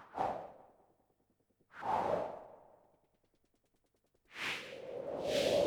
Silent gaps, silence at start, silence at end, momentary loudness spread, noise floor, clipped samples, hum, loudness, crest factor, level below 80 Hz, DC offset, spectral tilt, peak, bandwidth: none; 0 s; 0 s; 19 LU; -78 dBFS; under 0.1%; none; -39 LUFS; 20 dB; -70 dBFS; under 0.1%; -3.5 dB/octave; -22 dBFS; 19.5 kHz